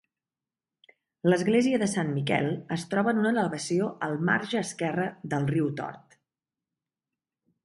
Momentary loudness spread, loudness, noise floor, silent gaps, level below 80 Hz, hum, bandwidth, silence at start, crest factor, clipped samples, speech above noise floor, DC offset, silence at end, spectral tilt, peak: 7 LU; -27 LUFS; under -90 dBFS; none; -70 dBFS; none; 11.5 kHz; 1.25 s; 18 dB; under 0.1%; over 63 dB; under 0.1%; 1.65 s; -5.5 dB/octave; -10 dBFS